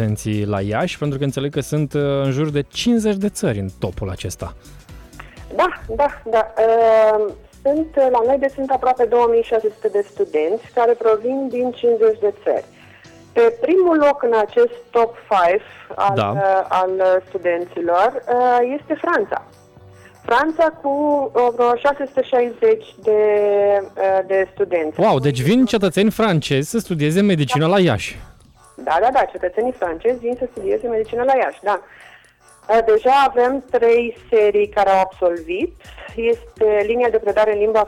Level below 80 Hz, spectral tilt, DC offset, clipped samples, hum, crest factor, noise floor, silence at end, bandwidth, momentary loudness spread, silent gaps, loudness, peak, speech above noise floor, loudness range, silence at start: -46 dBFS; -6 dB/octave; under 0.1%; under 0.1%; none; 12 dB; -49 dBFS; 0 s; 14.5 kHz; 7 LU; none; -18 LUFS; -6 dBFS; 32 dB; 4 LU; 0 s